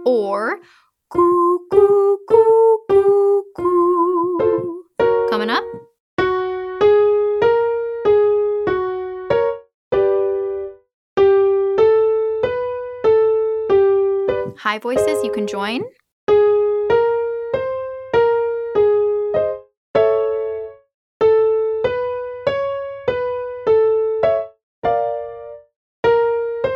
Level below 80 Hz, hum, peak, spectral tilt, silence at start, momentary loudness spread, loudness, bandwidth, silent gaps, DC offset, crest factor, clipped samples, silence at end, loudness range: -52 dBFS; none; 0 dBFS; -6 dB/octave; 0 s; 11 LU; -17 LUFS; 11.5 kHz; 6.00-6.17 s, 9.74-9.91 s, 10.94-11.16 s, 16.12-16.27 s, 19.77-19.94 s, 20.94-21.20 s, 24.63-24.82 s, 25.76-26.03 s; under 0.1%; 16 dB; under 0.1%; 0 s; 5 LU